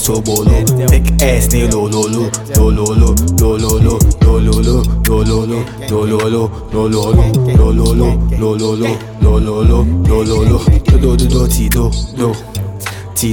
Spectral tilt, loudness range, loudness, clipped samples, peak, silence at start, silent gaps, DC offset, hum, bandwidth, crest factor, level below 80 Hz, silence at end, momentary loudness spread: -6 dB/octave; 1 LU; -12 LUFS; under 0.1%; 0 dBFS; 0 s; none; under 0.1%; none; 17.5 kHz; 10 dB; -14 dBFS; 0 s; 7 LU